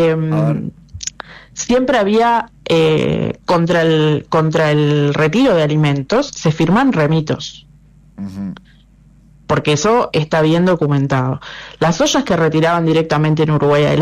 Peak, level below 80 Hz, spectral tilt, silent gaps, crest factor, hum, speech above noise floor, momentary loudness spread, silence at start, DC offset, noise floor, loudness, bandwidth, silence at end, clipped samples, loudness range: -6 dBFS; -44 dBFS; -6 dB/octave; none; 8 dB; none; 32 dB; 13 LU; 0 s; under 0.1%; -46 dBFS; -14 LUFS; 10.5 kHz; 0 s; under 0.1%; 5 LU